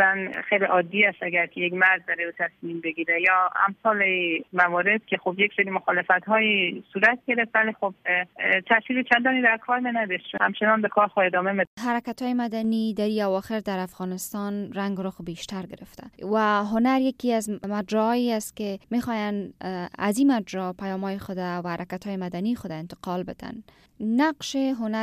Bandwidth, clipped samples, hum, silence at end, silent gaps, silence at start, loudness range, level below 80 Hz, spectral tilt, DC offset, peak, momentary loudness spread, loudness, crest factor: 15.5 kHz; under 0.1%; none; 0 s; 11.67-11.77 s; 0 s; 7 LU; -64 dBFS; -5 dB/octave; under 0.1%; -6 dBFS; 12 LU; -24 LUFS; 20 dB